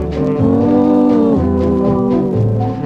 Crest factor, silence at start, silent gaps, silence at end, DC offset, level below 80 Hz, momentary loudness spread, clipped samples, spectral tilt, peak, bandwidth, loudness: 10 dB; 0 s; none; 0 s; under 0.1%; -32 dBFS; 4 LU; under 0.1%; -10.5 dB/octave; -2 dBFS; 6.8 kHz; -13 LUFS